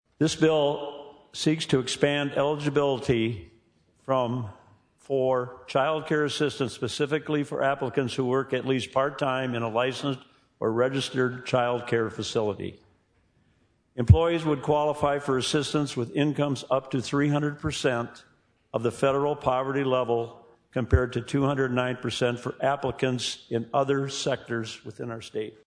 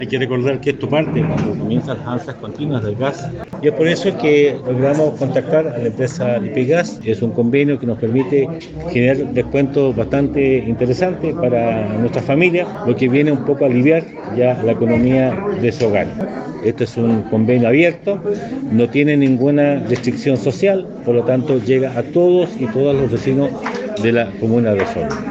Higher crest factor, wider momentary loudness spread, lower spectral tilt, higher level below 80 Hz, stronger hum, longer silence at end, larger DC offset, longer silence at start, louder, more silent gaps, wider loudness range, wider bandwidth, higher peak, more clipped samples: first, 24 dB vs 16 dB; about the same, 8 LU vs 7 LU; second, -5.5 dB/octave vs -7.5 dB/octave; about the same, -44 dBFS vs -46 dBFS; neither; first, 0.15 s vs 0 s; neither; first, 0.2 s vs 0 s; second, -27 LUFS vs -16 LUFS; neither; about the same, 3 LU vs 2 LU; first, 10.5 kHz vs 8 kHz; about the same, -2 dBFS vs 0 dBFS; neither